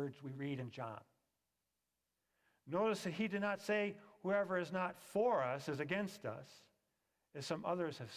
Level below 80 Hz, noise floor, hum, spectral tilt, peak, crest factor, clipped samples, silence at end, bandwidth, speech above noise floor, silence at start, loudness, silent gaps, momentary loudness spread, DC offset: -82 dBFS; -89 dBFS; none; -6 dB/octave; -24 dBFS; 18 dB; under 0.1%; 0 s; 16 kHz; 49 dB; 0 s; -40 LUFS; none; 12 LU; under 0.1%